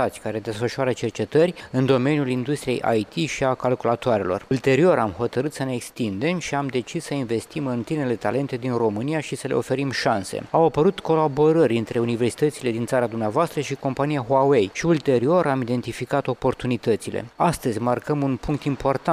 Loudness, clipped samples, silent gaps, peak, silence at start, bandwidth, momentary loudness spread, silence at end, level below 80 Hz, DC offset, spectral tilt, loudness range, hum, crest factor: -23 LUFS; under 0.1%; none; -6 dBFS; 0 s; 15.5 kHz; 8 LU; 0 s; -52 dBFS; under 0.1%; -6 dB/octave; 4 LU; none; 16 dB